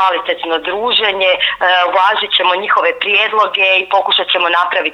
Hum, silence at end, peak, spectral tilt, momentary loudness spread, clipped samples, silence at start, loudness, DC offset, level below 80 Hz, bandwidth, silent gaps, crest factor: none; 0 s; 0 dBFS; -2.5 dB/octave; 4 LU; under 0.1%; 0 s; -12 LUFS; under 0.1%; -56 dBFS; 9.8 kHz; none; 12 dB